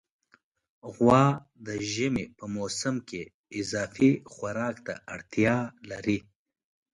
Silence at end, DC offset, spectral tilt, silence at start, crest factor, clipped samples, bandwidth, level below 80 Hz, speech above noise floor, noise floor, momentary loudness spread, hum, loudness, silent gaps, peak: 0.75 s; under 0.1%; -5.5 dB/octave; 0.85 s; 20 dB; under 0.1%; 11.5 kHz; -60 dBFS; 39 dB; -66 dBFS; 16 LU; none; -28 LUFS; 3.34-3.44 s; -8 dBFS